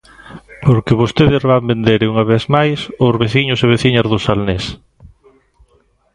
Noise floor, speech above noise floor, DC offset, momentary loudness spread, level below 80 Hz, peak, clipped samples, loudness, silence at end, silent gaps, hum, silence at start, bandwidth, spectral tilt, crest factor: -56 dBFS; 43 dB; under 0.1%; 5 LU; -38 dBFS; 0 dBFS; under 0.1%; -14 LUFS; 1.4 s; none; none; 0.25 s; 10.5 kHz; -7 dB/octave; 14 dB